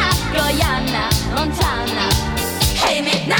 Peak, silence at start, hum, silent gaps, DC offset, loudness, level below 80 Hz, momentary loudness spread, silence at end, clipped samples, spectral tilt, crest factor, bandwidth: -2 dBFS; 0 s; none; none; under 0.1%; -17 LUFS; -26 dBFS; 3 LU; 0 s; under 0.1%; -3.5 dB/octave; 16 dB; over 20 kHz